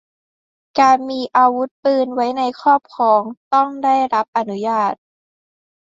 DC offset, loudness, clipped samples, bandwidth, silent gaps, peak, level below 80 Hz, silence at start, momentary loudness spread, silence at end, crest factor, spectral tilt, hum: under 0.1%; -17 LUFS; under 0.1%; 7.8 kHz; 1.71-1.83 s, 3.37-3.51 s, 4.28-4.33 s; -2 dBFS; -68 dBFS; 0.75 s; 7 LU; 1.05 s; 16 dB; -5 dB/octave; none